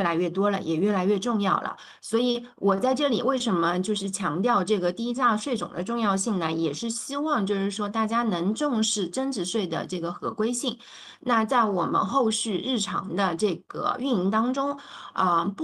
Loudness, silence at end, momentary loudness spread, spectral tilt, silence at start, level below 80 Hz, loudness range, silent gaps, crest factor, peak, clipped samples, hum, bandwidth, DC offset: -26 LUFS; 0 s; 6 LU; -4.5 dB/octave; 0 s; -68 dBFS; 2 LU; none; 18 dB; -8 dBFS; under 0.1%; none; 12.5 kHz; under 0.1%